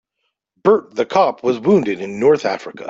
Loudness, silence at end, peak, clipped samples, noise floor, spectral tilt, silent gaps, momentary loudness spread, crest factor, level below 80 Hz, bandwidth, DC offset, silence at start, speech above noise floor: -17 LUFS; 0 s; -2 dBFS; under 0.1%; -74 dBFS; -6.5 dB/octave; none; 5 LU; 16 dB; -60 dBFS; 7.6 kHz; under 0.1%; 0.65 s; 57 dB